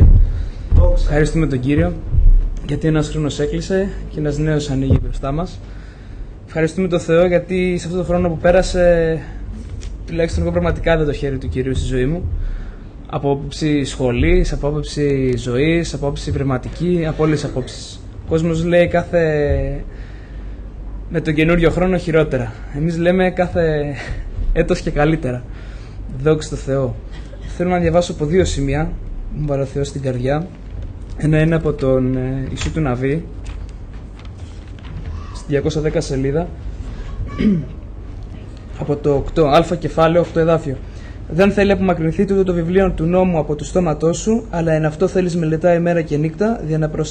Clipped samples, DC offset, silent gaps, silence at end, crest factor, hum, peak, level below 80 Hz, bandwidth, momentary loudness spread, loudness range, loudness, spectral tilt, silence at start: under 0.1%; under 0.1%; none; 0 s; 14 dB; none; -4 dBFS; -24 dBFS; 9.6 kHz; 18 LU; 5 LU; -18 LUFS; -7 dB/octave; 0 s